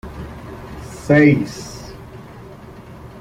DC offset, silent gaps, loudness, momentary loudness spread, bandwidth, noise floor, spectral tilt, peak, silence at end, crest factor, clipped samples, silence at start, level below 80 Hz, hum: under 0.1%; none; -15 LUFS; 26 LU; 14.5 kHz; -38 dBFS; -7 dB/octave; -2 dBFS; 0.15 s; 20 dB; under 0.1%; 0.05 s; -42 dBFS; none